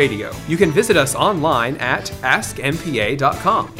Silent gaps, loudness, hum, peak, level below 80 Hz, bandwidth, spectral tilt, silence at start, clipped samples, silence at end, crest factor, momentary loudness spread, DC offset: none; -17 LUFS; none; 0 dBFS; -42 dBFS; 16 kHz; -4.5 dB/octave; 0 s; under 0.1%; 0 s; 18 dB; 7 LU; under 0.1%